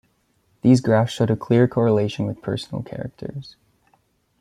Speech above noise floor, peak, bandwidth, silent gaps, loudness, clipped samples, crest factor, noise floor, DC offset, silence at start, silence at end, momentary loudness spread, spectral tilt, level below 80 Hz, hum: 45 dB; -4 dBFS; 11.5 kHz; none; -20 LUFS; under 0.1%; 18 dB; -65 dBFS; under 0.1%; 0.65 s; 0.9 s; 16 LU; -7.5 dB/octave; -56 dBFS; none